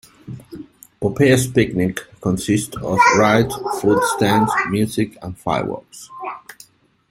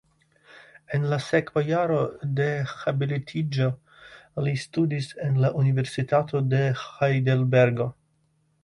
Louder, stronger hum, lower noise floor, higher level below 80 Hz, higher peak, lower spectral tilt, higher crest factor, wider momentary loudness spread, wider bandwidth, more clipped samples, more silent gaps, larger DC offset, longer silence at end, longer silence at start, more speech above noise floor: first, -18 LUFS vs -25 LUFS; neither; second, -49 dBFS vs -68 dBFS; first, -48 dBFS vs -62 dBFS; first, -2 dBFS vs -8 dBFS; second, -5.5 dB/octave vs -7.5 dB/octave; about the same, 18 dB vs 18 dB; first, 21 LU vs 7 LU; first, 16.5 kHz vs 11 kHz; neither; neither; neither; about the same, 0.6 s vs 0.7 s; second, 0.25 s vs 0.55 s; second, 31 dB vs 44 dB